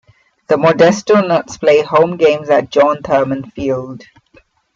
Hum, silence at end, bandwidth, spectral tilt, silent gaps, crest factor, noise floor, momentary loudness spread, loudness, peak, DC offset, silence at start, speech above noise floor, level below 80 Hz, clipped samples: none; 0.8 s; 7.6 kHz; -5.5 dB/octave; none; 12 dB; -50 dBFS; 10 LU; -13 LUFS; 0 dBFS; under 0.1%; 0.5 s; 38 dB; -50 dBFS; under 0.1%